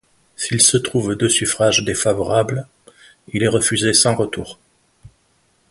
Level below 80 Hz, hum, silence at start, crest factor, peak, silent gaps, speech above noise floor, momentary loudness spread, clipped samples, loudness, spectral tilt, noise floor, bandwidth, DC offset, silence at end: -48 dBFS; none; 0.4 s; 20 dB; 0 dBFS; none; 43 dB; 14 LU; under 0.1%; -16 LUFS; -3 dB/octave; -61 dBFS; 12 kHz; under 0.1%; 1.2 s